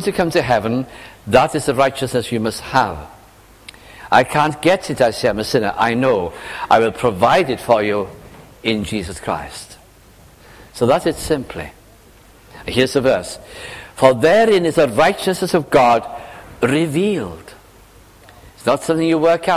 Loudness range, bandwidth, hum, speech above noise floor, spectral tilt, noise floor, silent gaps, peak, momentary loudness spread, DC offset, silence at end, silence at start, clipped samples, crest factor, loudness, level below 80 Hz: 7 LU; 16 kHz; none; 30 dB; -5 dB/octave; -46 dBFS; none; 0 dBFS; 18 LU; under 0.1%; 0 s; 0 s; under 0.1%; 18 dB; -17 LUFS; -44 dBFS